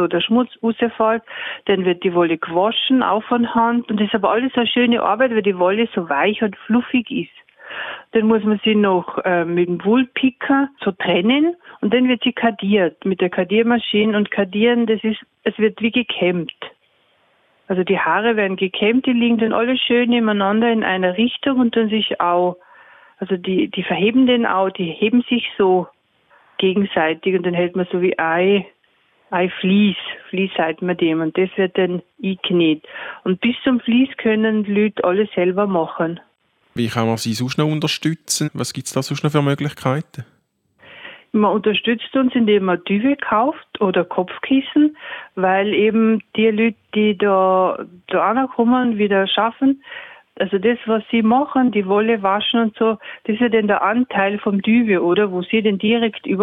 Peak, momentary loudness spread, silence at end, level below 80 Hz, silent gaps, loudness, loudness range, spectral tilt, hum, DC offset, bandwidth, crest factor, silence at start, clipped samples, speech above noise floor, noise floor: 0 dBFS; 8 LU; 0 s; -62 dBFS; none; -18 LUFS; 3 LU; -5.5 dB/octave; none; under 0.1%; 14.5 kHz; 18 dB; 0 s; under 0.1%; 44 dB; -62 dBFS